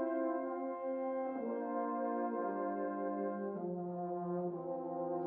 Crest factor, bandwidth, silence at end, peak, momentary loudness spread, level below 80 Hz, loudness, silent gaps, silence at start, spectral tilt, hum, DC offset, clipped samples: 12 dB; 3.3 kHz; 0 s; -26 dBFS; 3 LU; -84 dBFS; -39 LUFS; none; 0 s; -9.5 dB/octave; none; under 0.1%; under 0.1%